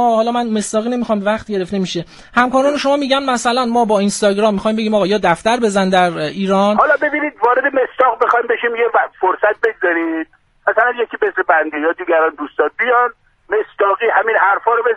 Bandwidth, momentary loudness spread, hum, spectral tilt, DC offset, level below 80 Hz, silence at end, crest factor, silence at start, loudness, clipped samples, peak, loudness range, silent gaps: 11.5 kHz; 6 LU; none; -4.5 dB/octave; under 0.1%; -52 dBFS; 0 s; 16 dB; 0 s; -15 LUFS; under 0.1%; 0 dBFS; 2 LU; none